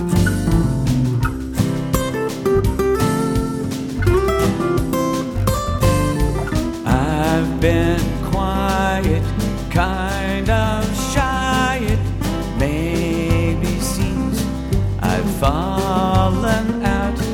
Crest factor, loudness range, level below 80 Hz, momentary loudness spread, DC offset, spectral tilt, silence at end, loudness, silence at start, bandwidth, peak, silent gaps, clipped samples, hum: 16 dB; 1 LU; -26 dBFS; 4 LU; under 0.1%; -6 dB/octave; 0 s; -19 LUFS; 0 s; 17.5 kHz; -2 dBFS; none; under 0.1%; none